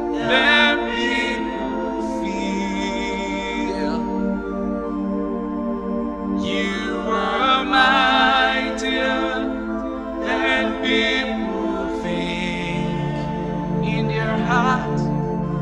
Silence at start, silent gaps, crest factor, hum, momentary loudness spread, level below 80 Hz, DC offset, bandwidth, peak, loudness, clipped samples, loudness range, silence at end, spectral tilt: 0 s; none; 20 dB; none; 10 LU; -40 dBFS; under 0.1%; 10.5 kHz; -2 dBFS; -21 LUFS; under 0.1%; 6 LU; 0 s; -5.5 dB/octave